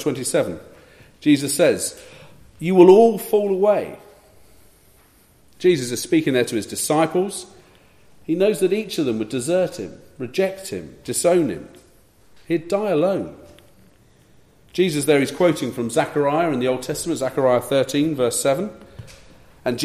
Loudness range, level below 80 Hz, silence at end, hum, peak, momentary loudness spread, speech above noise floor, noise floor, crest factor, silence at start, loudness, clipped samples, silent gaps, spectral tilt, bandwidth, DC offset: 6 LU; -56 dBFS; 0 s; none; 0 dBFS; 14 LU; 35 dB; -54 dBFS; 20 dB; 0 s; -20 LUFS; under 0.1%; none; -5 dB/octave; 15 kHz; under 0.1%